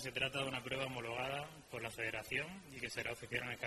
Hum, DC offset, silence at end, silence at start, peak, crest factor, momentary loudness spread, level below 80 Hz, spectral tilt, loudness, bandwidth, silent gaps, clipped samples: none; under 0.1%; 0 s; 0 s; -22 dBFS; 20 dB; 8 LU; -66 dBFS; -3.5 dB/octave; -42 LUFS; 13.5 kHz; none; under 0.1%